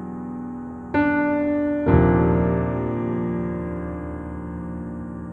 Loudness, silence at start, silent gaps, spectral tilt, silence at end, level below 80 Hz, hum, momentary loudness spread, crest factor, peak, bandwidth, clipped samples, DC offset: -23 LUFS; 0 s; none; -10.5 dB/octave; 0 s; -36 dBFS; none; 14 LU; 18 dB; -4 dBFS; 4.4 kHz; under 0.1%; under 0.1%